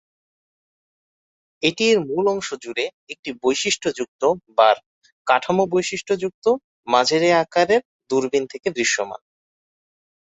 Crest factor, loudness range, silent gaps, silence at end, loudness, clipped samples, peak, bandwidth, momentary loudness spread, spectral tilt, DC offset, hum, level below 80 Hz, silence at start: 20 dB; 3 LU; 2.94-3.07 s, 3.19-3.23 s, 4.08-4.19 s, 4.86-5.01 s, 5.12-5.25 s, 6.34-6.42 s, 6.64-6.83 s, 7.85-8.00 s; 1.1 s; -20 LUFS; under 0.1%; -2 dBFS; 8.4 kHz; 9 LU; -3.5 dB/octave; under 0.1%; none; -64 dBFS; 1.6 s